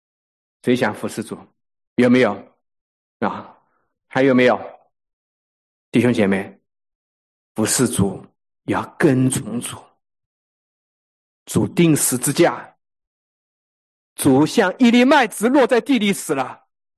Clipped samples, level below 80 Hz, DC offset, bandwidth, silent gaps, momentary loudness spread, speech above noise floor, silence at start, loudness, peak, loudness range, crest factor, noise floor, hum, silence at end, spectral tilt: under 0.1%; -54 dBFS; under 0.1%; 12.5 kHz; 1.87-1.96 s, 2.81-3.20 s, 5.13-5.92 s, 6.95-7.55 s, 10.26-11.46 s, 13.07-14.16 s; 18 LU; 51 dB; 0.65 s; -18 LUFS; -4 dBFS; 6 LU; 16 dB; -68 dBFS; none; 0.45 s; -5 dB/octave